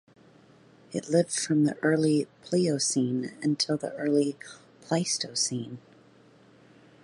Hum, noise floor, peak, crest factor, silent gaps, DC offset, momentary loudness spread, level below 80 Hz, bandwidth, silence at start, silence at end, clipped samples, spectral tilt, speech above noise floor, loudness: none; -57 dBFS; -10 dBFS; 18 dB; none; under 0.1%; 12 LU; -74 dBFS; 11.5 kHz; 0.9 s; 1.25 s; under 0.1%; -4.5 dB/octave; 30 dB; -27 LUFS